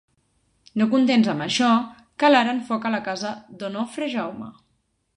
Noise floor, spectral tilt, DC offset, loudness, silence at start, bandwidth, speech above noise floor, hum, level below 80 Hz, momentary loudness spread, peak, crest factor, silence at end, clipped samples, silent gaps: -70 dBFS; -4.5 dB/octave; under 0.1%; -22 LUFS; 0.75 s; 11 kHz; 48 dB; none; -66 dBFS; 15 LU; -4 dBFS; 20 dB; 0.65 s; under 0.1%; none